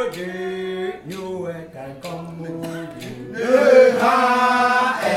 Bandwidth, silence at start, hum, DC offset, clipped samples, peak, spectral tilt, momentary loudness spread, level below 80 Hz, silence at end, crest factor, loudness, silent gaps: 14.5 kHz; 0 s; none; under 0.1%; under 0.1%; -2 dBFS; -5 dB/octave; 20 LU; -60 dBFS; 0 s; 18 dB; -17 LUFS; none